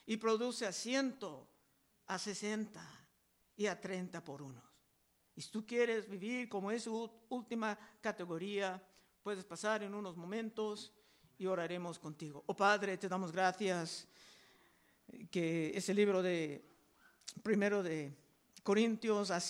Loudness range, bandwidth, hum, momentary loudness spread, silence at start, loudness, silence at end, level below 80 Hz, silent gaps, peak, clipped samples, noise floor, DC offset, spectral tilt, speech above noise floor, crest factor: 6 LU; over 20 kHz; none; 16 LU; 0.05 s; -39 LUFS; 0 s; -84 dBFS; none; -20 dBFS; under 0.1%; -76 dBFS; under 0.1%; -4.5 dB/octave; 38 dB; 20 dB